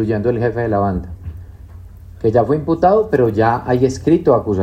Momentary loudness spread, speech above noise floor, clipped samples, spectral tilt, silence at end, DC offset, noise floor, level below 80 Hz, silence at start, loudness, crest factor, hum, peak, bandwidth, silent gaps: 14 LU; 21 dB; under 0.1%; -8 dB/octave; 0 s; under 0.1%; -36 dBFS; -38 dBFS; 0 s; -16 LUFS; 14 dB; none; -2 dBFS; 14.5 kHz; none